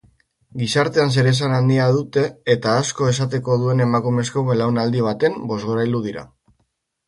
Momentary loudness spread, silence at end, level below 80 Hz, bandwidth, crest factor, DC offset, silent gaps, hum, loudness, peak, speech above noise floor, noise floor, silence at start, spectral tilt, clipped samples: 7 LU; 0.8 s; -56 dBFS; 11.5 kHz; 16 dB; under 0.1%; none; none; -19 LUFS; -4 dBFS; 51 dB; -69 dBFS; 0.55 s; -6 dB/octave; under 0.1%